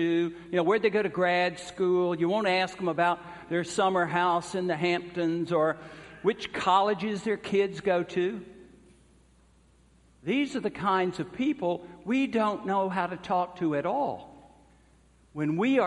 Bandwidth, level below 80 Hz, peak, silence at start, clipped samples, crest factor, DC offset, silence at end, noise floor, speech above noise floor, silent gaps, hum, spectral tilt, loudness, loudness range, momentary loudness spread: 11.5 kHz; -64 dBFS; -10 dBFS; 0 s; under 0.1%; 18 dB; under 0.1%; 0 s; -61 dBFS; 33 dB; none; none; -5.5 dB/octave; -28 LUFS; 5 LU; 7 LU